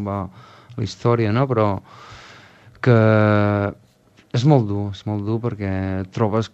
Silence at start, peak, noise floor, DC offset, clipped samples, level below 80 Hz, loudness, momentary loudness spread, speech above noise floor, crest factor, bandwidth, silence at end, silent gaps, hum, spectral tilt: 0 s; -2 dBFS; -54 dBFS; under 0.1%; under 0.1%; -56 dBFS; -20 LUFS; 14 LU; 35 dB; 18 dB; 7.8 kHz; 0.05 s; none; none; -8 dB/octave